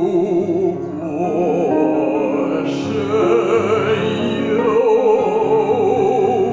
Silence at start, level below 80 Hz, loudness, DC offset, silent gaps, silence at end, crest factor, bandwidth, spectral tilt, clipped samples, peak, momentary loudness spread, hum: 0 s; -52 dBFS; -17 LUFS; under 0.1%; none; 0 s; 12 dB; 7.8 kHz; -7 dB/octave; under 0.1%; -4 dBFS; 6 LU; none